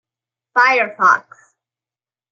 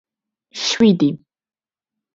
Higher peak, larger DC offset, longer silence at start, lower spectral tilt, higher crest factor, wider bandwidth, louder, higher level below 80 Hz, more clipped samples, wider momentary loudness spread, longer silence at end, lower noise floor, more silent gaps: about the same, -2 dBFS vs -2 dBFS; neither; about the same, 0.55 s vs 0.55 s; second, -2.5 dB/octave vs -5 dB/octave; about the same, 18 dB vs 18 dB; about the same, 7.6 kHz vs 7.8 kHz; about the same, -15 LUFS vs -17 LUFS; second, -82 dBFS vs -58 dBFS; neither; second, 6 LU vs 20 LU; about the same, 1.1 s vs 1 s; first, under -90 dBFS vs -85 dBFS; neither